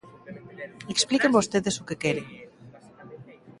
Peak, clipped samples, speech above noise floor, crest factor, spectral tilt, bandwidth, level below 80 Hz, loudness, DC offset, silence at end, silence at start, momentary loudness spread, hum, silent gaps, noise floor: -6 dBFS; under 0.1%; 25 dB; 22 dB; -3.5 dB/octave; 11.5 kHz; -62 dBFS; -25 LUFS; under 0.1%; 0.1 s; 0.05 s; 25 LU; none; none; -50 dBFS